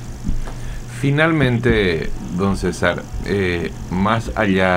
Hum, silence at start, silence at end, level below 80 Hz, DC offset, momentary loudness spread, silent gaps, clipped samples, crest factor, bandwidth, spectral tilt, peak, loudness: none; 0 s; 0 s; -28 dBFS; under 0.1%; 12 LU; none; under 0.1%; 18 dB; 16 kHz; -6.5 dB/octave; 0 dBFS; -19 LUFS